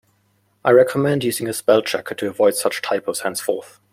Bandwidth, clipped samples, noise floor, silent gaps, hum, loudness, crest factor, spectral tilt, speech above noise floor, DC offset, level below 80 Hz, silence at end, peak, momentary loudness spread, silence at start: 16.5 kHz; under 0.1%; -63 dBFS; none; none; -19 LUFS; 18 dB; -4.5 dB/octave; 44 dB; under 0.1%; -62 dBFS; 0.25 s; -2 dBFS; 10 LU; 0.65 s